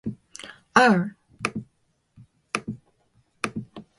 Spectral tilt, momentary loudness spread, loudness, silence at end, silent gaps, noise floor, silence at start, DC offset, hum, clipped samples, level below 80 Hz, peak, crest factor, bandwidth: -5 dB/octave; 23 LU; -24 LUFS; 0.15 s; none; -69 dBFS; 0.05 s; under 0.1%; none; under 0.1%; -62 dBFS; -2 dBFS; 24 dB; 11.5 kHz